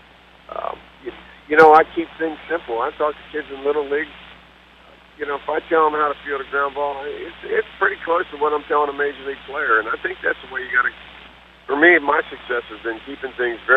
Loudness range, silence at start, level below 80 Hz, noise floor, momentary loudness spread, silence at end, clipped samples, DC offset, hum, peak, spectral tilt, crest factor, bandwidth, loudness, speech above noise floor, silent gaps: 5 LU; 0.5 s; -54 dBFS; -48 dBFS; 18 LU; 0 s; under 0.1%; under 0.1%; none; 0 dBFS; -5.5 dB/octave; 20 dB; 6.6 kHz; -20 LUFS; 28 dB; none